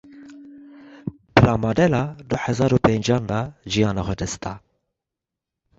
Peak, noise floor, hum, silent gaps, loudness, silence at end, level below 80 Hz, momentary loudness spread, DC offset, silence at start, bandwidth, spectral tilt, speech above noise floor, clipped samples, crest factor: -2 dBFS; -86 dBFS; none; none; -21 LUFS; 1.2 s; -42 dBFS; 17 LU; under 0.1%; 0.15 s; 8 kHz; -6 dB/octave; 65 dB; under 0.1%; 22 dB